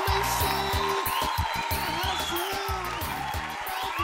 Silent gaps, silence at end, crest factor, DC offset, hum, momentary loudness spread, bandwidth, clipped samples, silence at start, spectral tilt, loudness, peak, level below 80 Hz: none; 0 s; 16 dB; under 0.1%; none; 6 LU; 16.5 kHz; under 0.1%; 0 s; -3 dB/octave; -28 LUFS; -12 dBFS; -40 dBFS